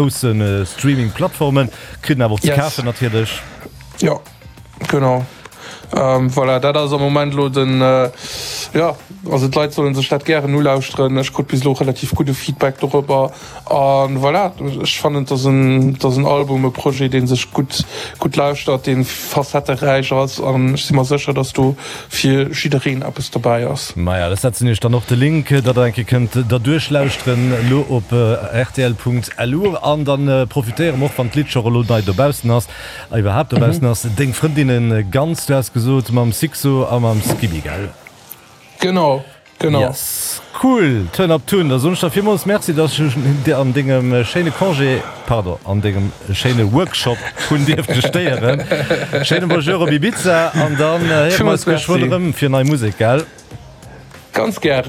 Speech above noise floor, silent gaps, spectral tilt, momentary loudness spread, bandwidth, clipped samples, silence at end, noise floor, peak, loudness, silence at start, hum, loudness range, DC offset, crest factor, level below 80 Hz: 24 dB; none; -6 dB/octave; 6 LU; 16 kHz; under 0.1%; 0 s; -39 dBFS; -2 dBFS; -16 LUFS; 0 s; none; 3 LU; under 0.1%; 12 dB; -42 dBFS